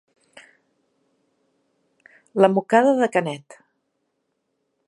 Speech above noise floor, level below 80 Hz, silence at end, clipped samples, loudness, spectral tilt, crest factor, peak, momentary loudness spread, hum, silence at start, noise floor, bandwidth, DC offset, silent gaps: 56 dB; -80 dBFS; 1.5 s; under 0.1%; -19 LUFS; -6.5 dB/octave; 24 dB; -2 dBFS; 15 LU; none; 2.35 s; -74 dBFS; 11.5 kHz; under 0.1%; none